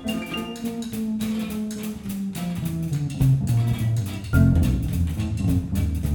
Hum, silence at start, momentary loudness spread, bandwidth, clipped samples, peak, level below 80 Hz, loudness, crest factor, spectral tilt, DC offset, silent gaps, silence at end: none; 0 s; 10 LU; over 20 kHz; under 0.1%; -6 dBFS; -34 dBFS; -24 LUFS; 16 dB; -7 dB/octave; under 0.1%; none; 0 s